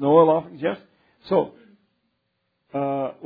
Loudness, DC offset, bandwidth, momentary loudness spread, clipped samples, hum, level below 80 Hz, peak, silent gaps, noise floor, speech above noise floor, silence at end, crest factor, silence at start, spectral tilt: -23 LUFS; under 0.1%; 4.9 kHz; 16 LU; under 0.1%; none; -70 dBFS; -4 dBFS; none; -74 dBFS; 55 dB; 0 s; 20 dB; 0 s; -10.5 dB/octave